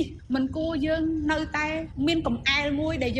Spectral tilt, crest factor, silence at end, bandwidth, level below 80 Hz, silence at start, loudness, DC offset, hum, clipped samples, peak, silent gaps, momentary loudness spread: -5.5 dB/octave; 16 dB; 0 s; 9.6 kHz; -42 dBFS; 0 s; -26 LUFS; under 0.1%; none; under 0.1%; -10 dBFS; none; 5 LU